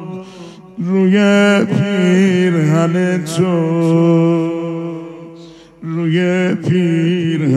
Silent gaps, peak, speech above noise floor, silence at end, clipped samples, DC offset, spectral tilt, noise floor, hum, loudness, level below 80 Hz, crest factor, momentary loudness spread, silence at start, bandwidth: none; -2 dBFS; 25 dB; 0 s; under 0.1%; under 0.1%; -7 dB/octave; -38 dBFS; none; -14 LUFS; -62 dBFS; 12 dB; 18 LU; 0 s; 12 kHz